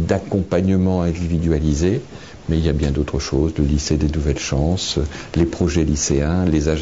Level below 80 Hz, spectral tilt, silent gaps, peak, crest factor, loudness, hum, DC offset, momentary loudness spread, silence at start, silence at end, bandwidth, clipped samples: -26 dBFS; -6 dB/octave; none; -4 dBFS; 14 dB; -19 LUFS; none; 0.4%; 4 LU; 0 s; 0 s; 8 kHz; under 0.1%